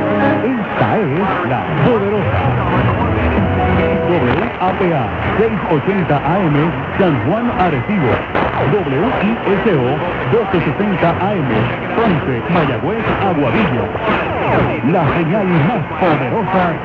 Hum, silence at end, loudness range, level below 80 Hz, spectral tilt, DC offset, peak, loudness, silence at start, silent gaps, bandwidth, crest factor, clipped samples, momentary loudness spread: none; 0 s; 1 LU; -32 dBFS; -9 dB/octave; under 0.1%; -2 dBFS; -15 LUFS; 0 s; none; 6.8 kHz; 14 dB; under 0.1%; 3 LU